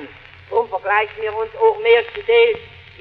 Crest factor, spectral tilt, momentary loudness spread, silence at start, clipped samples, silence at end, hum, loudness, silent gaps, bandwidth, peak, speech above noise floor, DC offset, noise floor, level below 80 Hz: 16 dB; -5.5 dB/octave; 10 LU; 0 s; under 0.1%; 0.35 s; none; -17 LUFS; none; 4.7 kHz; -2 dBFS; 23 dB; under 0.1%; -39 dBFS; -54 dBFS